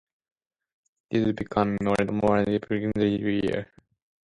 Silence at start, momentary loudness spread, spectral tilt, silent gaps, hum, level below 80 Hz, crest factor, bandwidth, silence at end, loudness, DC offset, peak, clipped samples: 1.1 s; 6 LU; -7.5 dB/octave; none; none; -52 dBFS; 18 dB; 11.5 kHz; 0.6 s; -26 LUFS; under 0.1%; -8 dBFS; under 0.1%